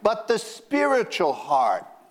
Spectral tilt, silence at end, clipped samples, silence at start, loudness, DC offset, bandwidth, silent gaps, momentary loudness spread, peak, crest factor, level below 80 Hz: -3.5 dB/octave; 0.25 s; under 0.1%; 0 s; -23 LUFS; under 0.1%; 16 kHz; none; 5 LU; -4 dBFS; 18 dB; -66 dBFS